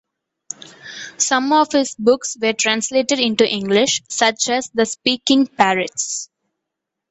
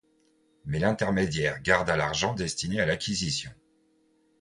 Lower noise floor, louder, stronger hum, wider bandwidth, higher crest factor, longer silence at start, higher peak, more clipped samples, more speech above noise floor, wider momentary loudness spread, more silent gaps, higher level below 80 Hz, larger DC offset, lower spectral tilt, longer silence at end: first, -81 dBFS vs -67 dBFS; first, -17 LUFS vs -27 LUFS; neither; second, 8.4 kHz vs 11.5 kHz; about the same, 18 dB vs 22 dB; first, 0.85 s vs 0.65 s; first, 0 dBFS vs -6 dBFS; neither; first, 63 dB vs 39 dB; first, 17 LU vs 8 LU; neither; second, -62 dBFS vs -50 dBFS; neither; second, -2 dB/octave vs -4 dB/octave; about the same, 0.85 s vs 0.9 s